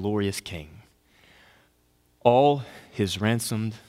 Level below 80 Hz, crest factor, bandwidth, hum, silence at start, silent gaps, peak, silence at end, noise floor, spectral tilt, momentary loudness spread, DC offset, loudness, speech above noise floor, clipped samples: -58 dBFS; 24 dB; 16 kHz; none; 0 s; none; -4 dBFS; 0.1 s; -65 dBFS; -5.5 dB/octave; 18 LU; under 0.1%; -24 LUFS; 40 dB; under 0.1%